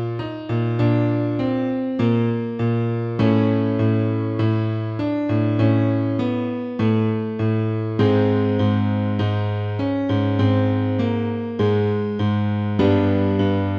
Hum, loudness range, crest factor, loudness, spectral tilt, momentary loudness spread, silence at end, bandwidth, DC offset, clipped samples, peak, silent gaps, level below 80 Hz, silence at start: none; 1 LU; 14 dB; -21 LUFS; -9.5 dB/octave; 5 LU; 0 s; 5.4 kHz; under 0.1%; under 0.1%; -6 dBFS; none; -52 dBFS; 0 s